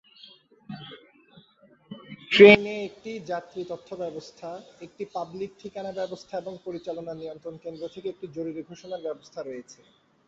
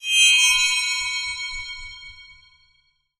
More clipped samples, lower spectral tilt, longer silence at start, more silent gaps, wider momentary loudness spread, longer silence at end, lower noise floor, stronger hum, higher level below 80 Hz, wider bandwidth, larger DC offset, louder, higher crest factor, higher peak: neither; first, -3 dB/octave vs 5.5 dB/octave; first, 0.7 s vs 0 s; neither; about the same, 21 LU vs 22 LU; second, 0.55 s vs 0.95 s; second, -59 dBFS vs -65 dBFS; neither; second, -66 dBFS vs -50 dBFS; second, 7.6 kHz vs 19.5 kHz; neither; second, -24 LUFS vs -17 LUFS; first, 26 dB vs 18 dB; first, 0 dBFS vs -4 dBFS